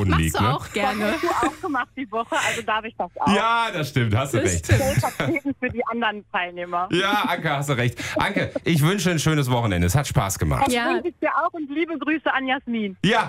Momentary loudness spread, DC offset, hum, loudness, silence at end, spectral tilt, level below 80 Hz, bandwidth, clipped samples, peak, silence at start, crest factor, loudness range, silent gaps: 6 LU; under 0.1%; none; -22 LUFS; 0 s; -5 dB/octave; -40 dBFS; 16 kHz; under 0.1%; -4 dBFS; 0 s; 18 dB; 2 LU; none